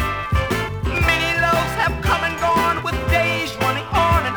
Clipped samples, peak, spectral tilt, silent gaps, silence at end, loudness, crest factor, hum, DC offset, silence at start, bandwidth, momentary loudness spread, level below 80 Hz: under 0.1%; -4 dBFS; -5 dB/octave; none; 0 s; -19 LUFS; 14 dB; none; under 0.1%; 0 s; over 20 kHz; 5 LU; -30 dBFS